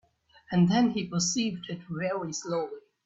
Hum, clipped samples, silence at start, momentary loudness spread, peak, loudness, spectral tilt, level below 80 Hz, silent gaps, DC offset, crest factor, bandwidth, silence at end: none; under 0.1%; 0.5 s; 12 LU; -14 dBFS; -28 LUFS; -5 dB/octave; -66 dBFS; none; under 0.1%; 16 dB; 8 kHz; 0.25 s